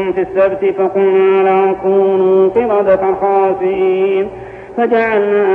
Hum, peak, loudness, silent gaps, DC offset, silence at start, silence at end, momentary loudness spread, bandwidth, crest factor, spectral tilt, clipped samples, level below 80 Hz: none; -2 dBFS; -12 LUFS; none; under 0.1%; 0 s; 0 s; 5 LU; 3.8 kHz; 10 dB; -8.5 dB/octave; under 0.1%; -48 dBFS